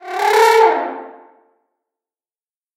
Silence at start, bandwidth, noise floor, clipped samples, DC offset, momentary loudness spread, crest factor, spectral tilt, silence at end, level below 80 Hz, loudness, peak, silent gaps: 0.05 s; 16.5 kHz; under -90 dBFS; under 0.1%; under 0.1%; 17 LU; 18 dB; 0 dB/octave; 1.65 s; -78 dBFS; -13 LUFS; 0 dBFS; none